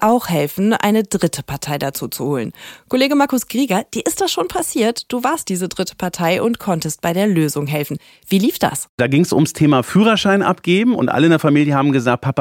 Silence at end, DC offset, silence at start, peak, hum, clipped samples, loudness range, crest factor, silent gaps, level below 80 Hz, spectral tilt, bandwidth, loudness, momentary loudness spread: 0 s; under 0.1%; 0 s; 0 dBFS; none; under 0.1%; 5 LU; 16 dB; 8.89-8.98 s; -52 dBFS; -5 dB/octave; 17 kHz; -17 LUFS; 9 LU